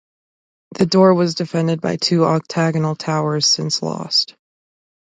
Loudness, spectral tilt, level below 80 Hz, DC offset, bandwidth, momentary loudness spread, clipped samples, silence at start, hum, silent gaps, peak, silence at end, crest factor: -17 LUFS; -5 dB/octave; -60 dBFS; under 0.1%; 9.4 kHz; 8 LU; under 0.1%; 0.7 s; none; none; 0 dBFS; 0.8 s; 18 dB